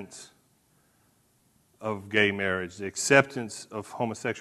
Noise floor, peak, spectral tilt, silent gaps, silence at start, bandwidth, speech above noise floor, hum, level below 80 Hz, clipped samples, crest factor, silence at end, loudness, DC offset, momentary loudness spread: -66 dBFS; -4 dBFS; -3.5 dB/octave; none; 0 s; 13 kHz; 39 dB; none; -68 dBFS; under 0.1%; 26 dB; 0 s; -27 LUFS; under 0.1%; 17 LU